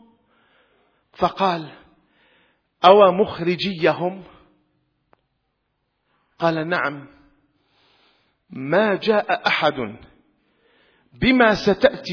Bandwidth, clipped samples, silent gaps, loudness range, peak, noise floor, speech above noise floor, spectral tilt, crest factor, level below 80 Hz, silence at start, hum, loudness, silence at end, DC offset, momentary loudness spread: 5.4 kHz; under 0.1%; none; 9 LU; 0 dBFS; -73 dBFS; 54 dB; -6 dB/octave; 22 dB; -52 dBFS; 1.2 s; none; -19 LUFS; 0 s; under 0.1%; 16 LU